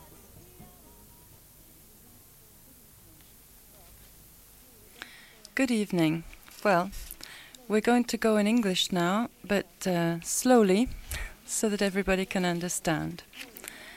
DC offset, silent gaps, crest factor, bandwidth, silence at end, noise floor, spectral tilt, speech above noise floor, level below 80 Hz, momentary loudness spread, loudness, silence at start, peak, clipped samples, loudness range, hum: under 0.1%; none; 20 dB; 17 kHz; 0 s; -55 dBFS; -4.5 dB/octave; 28 dB; -52 dBFS; 19 LU; -27 LUFS; 0 s; -10 dBFS; under 0.1%; 7 LU; none